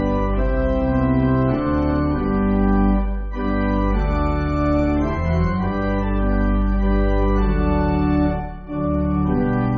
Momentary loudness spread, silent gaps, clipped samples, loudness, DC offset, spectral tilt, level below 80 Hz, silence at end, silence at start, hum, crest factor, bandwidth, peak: 4 LU; none; under 0.1%; -20 LUFS; under 0.1%; -8 dB/octave; -24 dBFS; 0 s; 0 s; none; 12 dB; 5 kHz; -6 dBFS